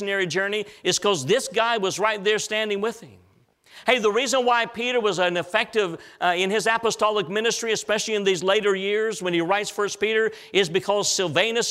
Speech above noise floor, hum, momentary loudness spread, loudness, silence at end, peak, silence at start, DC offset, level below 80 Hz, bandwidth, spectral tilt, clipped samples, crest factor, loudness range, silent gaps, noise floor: 34 dB; none; 4 LU; -22 LUFS; 0 s; -4 dBFS; 0 s; under 0.1%; -66 dBFS; 15 kHz; -2.5 dB/octave; under 0.1%; 20 dB; 1 LU; none; -57 dBFS